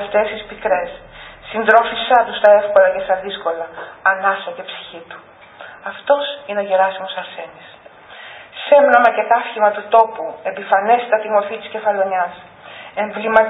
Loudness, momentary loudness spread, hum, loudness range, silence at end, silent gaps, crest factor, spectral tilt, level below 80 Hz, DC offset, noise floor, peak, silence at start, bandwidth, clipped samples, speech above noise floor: -16 LUFS; 22 LU; none; 7 LU; 0 s; none; 18 dB; -6 dB/octave; -56 dBFS; under 0.1%; -39 dBFS; 0 dBFS; 0 s; 4 kHz; under 0.1%; 23 dB